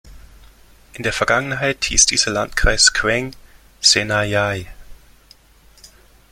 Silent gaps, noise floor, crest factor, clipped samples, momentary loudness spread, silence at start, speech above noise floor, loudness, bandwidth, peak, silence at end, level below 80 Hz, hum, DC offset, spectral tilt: none; -50 dBFS; 20 dB; under 0.1%; 10 LU; 0.05 s; 32 dB; -16 LUFS; 16.5 kHz; 0 dBFS; 0.45 s; -32 dBFS; none; under 0.1%; -1.5 dB/octave